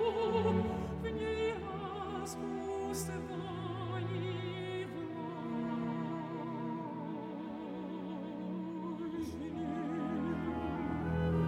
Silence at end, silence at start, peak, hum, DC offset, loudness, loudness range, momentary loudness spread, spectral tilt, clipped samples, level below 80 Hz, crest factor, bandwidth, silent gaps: 0 s; 0 s; -20 dBFS; none; under 0.1%; -38 LUFS; 4 LU; 8 LU; -6.5 dB/octave; under 0.1%; -56 dBFS; 18 dB; 16 kHz; none